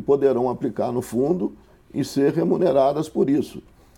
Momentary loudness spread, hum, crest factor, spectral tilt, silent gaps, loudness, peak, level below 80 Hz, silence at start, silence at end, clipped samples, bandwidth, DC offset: 11 LU; none; 16 dB; -7.5 dB/octave; none; -22 LUFS; -6 dBFS; -54 dBFS; 0 s; 0.35 s; under 0.1%; 16.5 kHz; under 0.1%